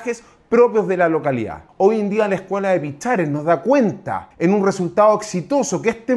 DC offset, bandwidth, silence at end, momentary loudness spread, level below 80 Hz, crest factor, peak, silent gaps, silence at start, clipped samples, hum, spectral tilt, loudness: under 0.1%; 12 kHz; 0 s; 8 LU; -56 dBFS; 16 dB; -2 dBFS; none; 0 s; under 0.1%; none; -6 dB/octave; -18 LUFS